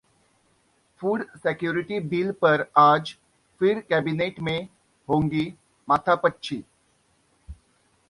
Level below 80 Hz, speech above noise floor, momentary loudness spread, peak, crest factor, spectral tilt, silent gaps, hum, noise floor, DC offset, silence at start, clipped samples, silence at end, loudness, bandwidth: -56 dBFS; 42 dB; 15 LU; -2 dBFS; 22 dB; -7 dB/octave; none; none; -65 dBFS; under 0.1%; 1 s; under 0.1%; 0.55 s; -24 LUFS; 11.5 kHz